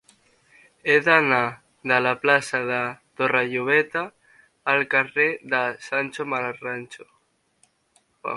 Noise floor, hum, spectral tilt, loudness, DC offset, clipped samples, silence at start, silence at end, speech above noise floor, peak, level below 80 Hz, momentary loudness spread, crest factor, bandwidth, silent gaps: -65 dBFS; none; -4.5 dB/octave; -22 LUFS; under 0.1%; under 0.1%; 0.85 s; 0 s; 42 dB; 0 dBFS; -70 dBFS; 14 LU; 24 dB; 11.5 kHz; none